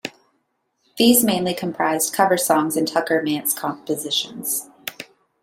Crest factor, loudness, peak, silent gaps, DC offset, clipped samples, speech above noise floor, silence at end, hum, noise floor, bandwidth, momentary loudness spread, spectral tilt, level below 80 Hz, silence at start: 20 dB; -20 LUFS; -2 dBFS; none; under 0.1%; under 0.1%; 50 dB; 0.4 s; none; -70 dBFS; 16.5 kHz; 17 LU; -3 dB/octave; -64 dBFS; 0.05 s